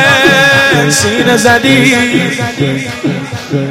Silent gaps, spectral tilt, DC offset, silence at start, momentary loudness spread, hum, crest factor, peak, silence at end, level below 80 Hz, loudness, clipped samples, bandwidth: none; -4 dB/octave; under 0.1%; 0 s; 11 LU; none; 10 dB; 0 dBFS; 0 s; -42 dBFS; -8 LUFS; 0.3%; 16.5 kHz